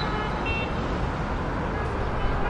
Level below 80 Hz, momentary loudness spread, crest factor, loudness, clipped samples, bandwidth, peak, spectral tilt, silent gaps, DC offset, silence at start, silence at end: -32 dBFS; 2 LU; 14 dB; -28 LUFS; under 0.1%; 10 kHz; -14 dBFS; -7 dB/octave; none; under 0.1%; 0 s; 0 s